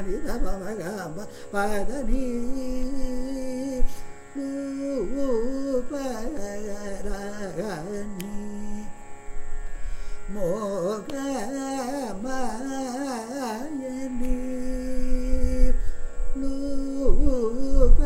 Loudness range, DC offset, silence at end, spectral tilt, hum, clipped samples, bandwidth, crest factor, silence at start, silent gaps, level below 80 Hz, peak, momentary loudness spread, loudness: 5 LU; under 0.1%; 0 s; -6 dB/octave; none; under 0.1%; 10.5 kHz; 20 dB; 0 s; none; -26 dBFS; -2 dBFS; 11 LU; -30 LUFS